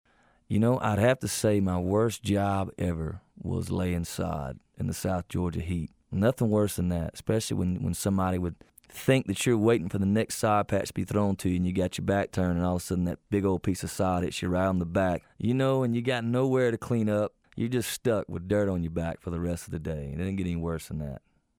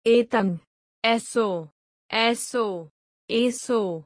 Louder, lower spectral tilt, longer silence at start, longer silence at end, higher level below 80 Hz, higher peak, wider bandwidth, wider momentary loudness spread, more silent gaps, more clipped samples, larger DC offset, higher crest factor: second, -28 LUFS vs -24 LUFS; first, -6 dB/octave vs -4 dB/octave; first, 0.5 s vs 0.05 s; first, 0.4 s vs 0.05 s; first, -48 dBFS vs -70 dBFS; about the same, -8 dBFS vs -6 dBFS; first, 19 kHz vs 10.5 kHz; about the same, 9 LU vs 8 LU; second, none vs 0.67-1.02 s, 1.72-2.09 s, 2.91-3.28 s; neither; neither; about the same, 20 dB vs 18 dB